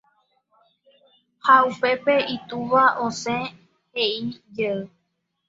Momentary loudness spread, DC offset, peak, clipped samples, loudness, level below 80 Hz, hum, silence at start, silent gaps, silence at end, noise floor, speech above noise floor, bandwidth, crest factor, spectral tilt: 15 LU; under 0.1%; -2 dBFS; under 0.1%; -21 LUFS; -66 dBFS; none; 1.45 s; none; 0.6 s; -75 dBFS; 54 dB; 7.8 kHz; 22 dB; -4 dB/octave